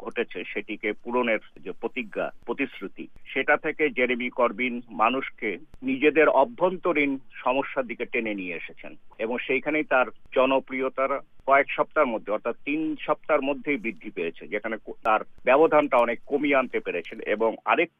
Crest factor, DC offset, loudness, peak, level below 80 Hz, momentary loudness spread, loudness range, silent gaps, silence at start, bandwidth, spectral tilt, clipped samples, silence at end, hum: 20 dB; under 0.1%; -25 LUFS; -6 dBFS; -58 dBFS; 11 LU; 4 LU; none; 0 s; 4.8 kHz; -7 dB/octave; under 0.1%; 0.15 s; none